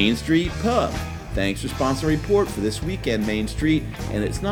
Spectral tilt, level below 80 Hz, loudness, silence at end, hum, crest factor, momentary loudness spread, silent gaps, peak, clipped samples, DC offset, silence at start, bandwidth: -5.5 dB/octave; -34 dBFS; -23 LUFS; 0 s; none; 18 dB; 6 LU; none; -4 dBFS; under 0.1%; under 0.1%; 0 s; 18.5 kHz